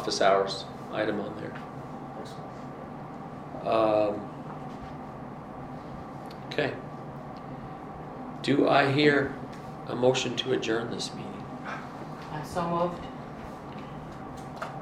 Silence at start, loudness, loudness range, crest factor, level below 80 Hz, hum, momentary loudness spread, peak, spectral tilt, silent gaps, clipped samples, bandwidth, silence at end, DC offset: 0 s; -30 LUFS; 11 LU; 22 dB; -58 dBFS; none; 17 LU; -8 dBFS; -5 dB/octave; none; under 0.1%; 14 kHz; 0 s; under 0.1%